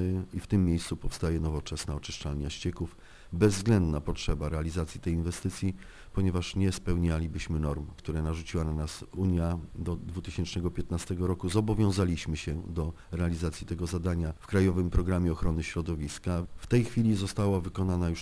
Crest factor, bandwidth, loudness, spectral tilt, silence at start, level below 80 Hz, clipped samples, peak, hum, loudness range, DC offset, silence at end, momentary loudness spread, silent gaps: 20 dB; 11 kHz; -31 LUFS; -6.5 dB/octave; 0 s; -40 dBFS; under 0.1%; -10 dBFS; none; 3 LU; under 0.1%; 0 s; 9 LU; none